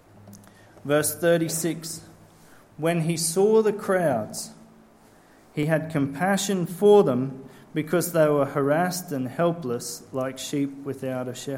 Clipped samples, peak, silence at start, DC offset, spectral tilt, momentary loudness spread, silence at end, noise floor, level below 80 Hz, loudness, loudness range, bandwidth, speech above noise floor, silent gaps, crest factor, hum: under 0.1%; -6 dBFS; 0.25 s; under 0.1%; -5 dB/octave; 13 LU; 0 s; -54 dBFS; -66 dBFS; -24 LUFS; 4 LU; 16.5 kHz; 30 dB; none; 20 dB; none